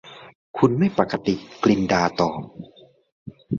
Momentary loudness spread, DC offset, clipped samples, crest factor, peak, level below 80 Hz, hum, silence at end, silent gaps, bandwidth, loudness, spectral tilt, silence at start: 19 LU; under 0.1%; under 0.1%; 20 dB; -2 dBFS; -52 dBFS; none; 0 s; 0.35-0.54 s, 3.12-3.26 s; 7.2 kHz; -21 LUFS; -6.5 dB/octave; 0.05 s